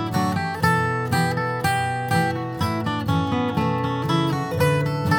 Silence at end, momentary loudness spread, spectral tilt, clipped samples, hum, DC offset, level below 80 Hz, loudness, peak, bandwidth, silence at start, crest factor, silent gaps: 0 s; 4 LU; -6 dB/octave; under 0.1%; none; under 0.1%; -50 dBFS; -22 LUFS; -6 dBFS; 20 kHz; 0 s; 16 dB; none